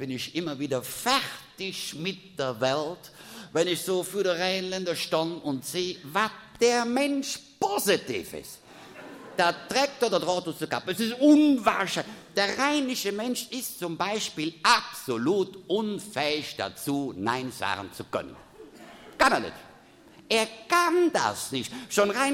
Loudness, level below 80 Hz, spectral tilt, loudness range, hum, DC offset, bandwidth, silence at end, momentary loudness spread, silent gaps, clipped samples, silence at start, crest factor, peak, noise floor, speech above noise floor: -27 LUFS; -64 dBFS; -3.5 dB/octave; 5 LU; none; under 0.1%; 16.5 kHz; 0 s; 12 LU; none; under 0.1%; 0 s; 20 dB; -8 dBFS; -53 dBFS; 26 dB